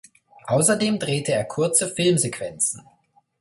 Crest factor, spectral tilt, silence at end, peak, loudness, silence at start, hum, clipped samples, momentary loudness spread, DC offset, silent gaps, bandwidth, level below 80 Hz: 20 dB; -3.5 dB/octave; 0.6 s; -4 dBFS; -21 LUFS; 0.45 s; none; under 0.1%; 6 LU; under 0.1%; none; 12 kHz; -62 dBFS